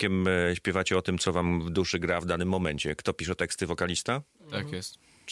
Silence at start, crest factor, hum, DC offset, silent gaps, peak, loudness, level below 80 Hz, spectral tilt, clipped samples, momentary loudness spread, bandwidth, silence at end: 0 s; 18 dB; none; under 0.1%; none; -12 dBFS; -29 LUFS; -54 dBFS; -4.5 dB/octave; under 0.1%; 10 LU; 12 kHz; 0 s